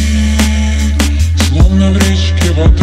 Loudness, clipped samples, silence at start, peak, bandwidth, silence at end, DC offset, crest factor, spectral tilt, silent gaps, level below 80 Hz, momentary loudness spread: -11 LUFS; 1%; 0 s; 0 dBFS; 14.5 kHz; 0 s; under 0.1%; 8 dB; -5.5 dB/octave; none; -12 dBFS; 3 LU